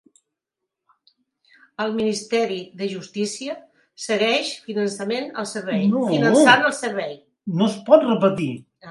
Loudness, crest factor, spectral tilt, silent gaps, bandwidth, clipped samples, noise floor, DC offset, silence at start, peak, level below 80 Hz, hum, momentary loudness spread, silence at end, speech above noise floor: -21 LUFS; 22 dB; -4.5 dB/octave; none; 11.5 kHz; under 0.1%; -83 dBFS; under 0.1%; 1.8 s; 0 dBFS; -68 dBFS; none; 16 LU; 0 s; 63 dB